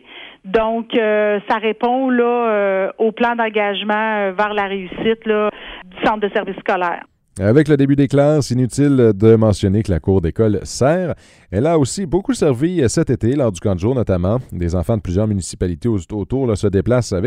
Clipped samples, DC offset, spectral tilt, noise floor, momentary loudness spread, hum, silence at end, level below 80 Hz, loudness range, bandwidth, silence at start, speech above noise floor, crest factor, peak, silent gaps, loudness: under 0.1%; under 0.1%; -6.5 dB/octave; -36 dBFS; 8 LU; none; 0 s; -38 dBFS; 5 LU; 13.5 kHz; 0.1 s; 20 dB; 16 dB; 0 dBFS; none; -17 LUFS